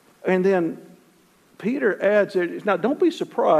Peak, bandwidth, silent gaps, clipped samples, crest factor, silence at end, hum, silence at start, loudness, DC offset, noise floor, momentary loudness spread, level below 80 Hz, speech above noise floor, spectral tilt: -6 dBFS; 12.5 kHz; none; under 0.1%; 16 dB; 0 s; none; 0.25 s; -22 LUFS; under 0.1%; -57 dBFS; 9 LU; -74 dBFS; 37 dB; -7 dB/octave